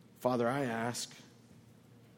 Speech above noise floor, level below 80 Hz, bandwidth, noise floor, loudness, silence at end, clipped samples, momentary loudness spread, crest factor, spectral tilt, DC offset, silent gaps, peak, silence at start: 25 dB; -76 dBFS; 18 kHz; -59 dBFS; -35 LUFS; 0.9 s; under 0.1%; 12 LU; 20 dB; -4.5 dB/octave; under 0.1%; none; -16 dBFS; 0.2 s